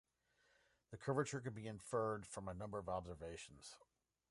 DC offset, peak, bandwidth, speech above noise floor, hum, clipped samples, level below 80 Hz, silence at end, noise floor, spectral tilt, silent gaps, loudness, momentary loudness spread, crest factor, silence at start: under 0.1%; -26 dBFS; 11.5 kHz; 34 dB; none; under 0.1%; -68 dBFS; 0.55 s; -80 dBFS; -5.5 dB/octave; none; -46 LUFS; 16 LU; 20 dB; 0.9 s